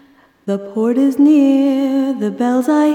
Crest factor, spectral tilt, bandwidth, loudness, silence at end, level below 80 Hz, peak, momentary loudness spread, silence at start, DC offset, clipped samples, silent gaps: 10 dB; -6.5 dB/octave; 14 kHz; -14 LUFS; 0 s; -70 dBFS; -4 dBFS; 12 LU; 0.45 s; under 0.1%; under 0.1%; none